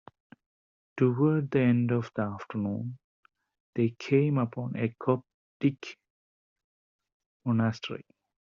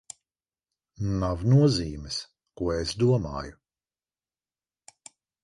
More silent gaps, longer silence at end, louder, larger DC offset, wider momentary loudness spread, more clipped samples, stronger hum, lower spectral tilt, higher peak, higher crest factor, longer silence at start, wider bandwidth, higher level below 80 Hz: first, 3.04-3.23 s, 3.60-3.73 s, 5.34-5.60 s, 6.10-6.56 s, 6.64-6.99 s, 7.14-7.20 s, 7.26-7.40 s vs none; second, 0.45 s vs 1.9 s; second, -29 LUFS vs -26 LUFS; neither; second, 15 LU vs 22 LU; neither; neither; about the same, -7.5 dB/octave vs -6.5 dB/octave; about the same, -12 dBFS vs -10 dBFS; about the same, 18 dB vs 18 dB; about the same, 0.95 s vs 1 s; second, 7.2 kHz vs 11.5 kHz; second, -70 dBFS vs -46 dBFS